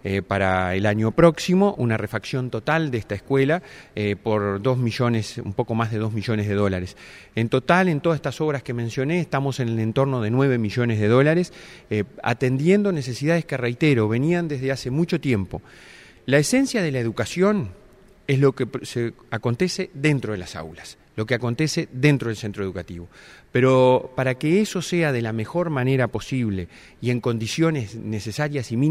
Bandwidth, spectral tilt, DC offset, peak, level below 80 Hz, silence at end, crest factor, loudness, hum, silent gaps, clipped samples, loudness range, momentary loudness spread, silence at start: 15 kHz; -6.5 dB/octave; under 0.1%; 0 dBFS; -52 dBFS; 0 s; 22 dB; -22 LUFS; none; none; under 0.1%; 3 LU; 11 LU; 0.05 s